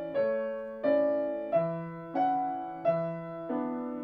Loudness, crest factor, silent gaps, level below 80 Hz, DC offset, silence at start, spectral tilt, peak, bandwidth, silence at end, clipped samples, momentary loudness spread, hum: -31 LUFS; 14 dB; none; -70 dBFS; under 0.1%; 0 s; -10 dB/octave; -16 dBFS; 5.6 kHz; 0 s; under 0.1%; 9 LU; none